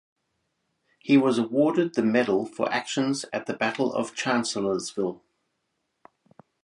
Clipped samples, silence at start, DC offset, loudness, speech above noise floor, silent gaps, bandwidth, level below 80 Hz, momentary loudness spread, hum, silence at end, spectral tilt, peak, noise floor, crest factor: under 0.1%; 1.05 s; under 0.1%; -25 LUFS; 53 dB; none; 11.5 kHz; -72 dBFS; 9 LU; none; 1.5 s; -4.5 dB/octave; -8 dBFS; -77 dBFS; 18 dB